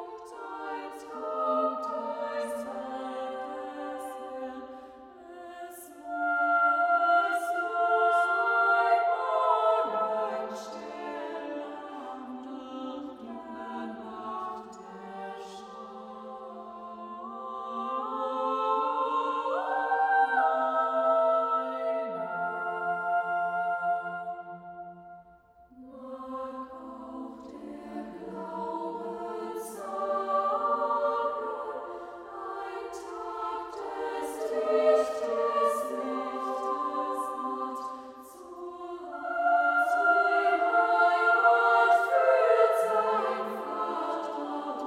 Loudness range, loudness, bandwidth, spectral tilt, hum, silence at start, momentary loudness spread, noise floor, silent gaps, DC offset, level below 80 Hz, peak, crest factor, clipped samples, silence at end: 15 LU; -28 LUFS; 15 kHz; -4 dB/octave; none; 0 s; 19 LU; -57 dBFS; none; under 0.1%; -72 dBFS; -10 dBFS; 20 dB; under 0.1%; 0 s